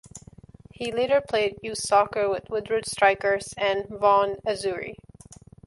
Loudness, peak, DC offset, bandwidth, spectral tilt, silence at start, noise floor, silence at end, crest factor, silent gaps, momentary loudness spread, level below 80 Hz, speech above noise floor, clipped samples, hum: -24 LUFS; -6 dBFS; under 0.1%; 11.5 kHz; -3 dB/octave; 0.05 s; -49 dBFS; 0.3 s; 18 dB; none; 12 LU; -56 dBFS; 25 dB; under 0.1%; none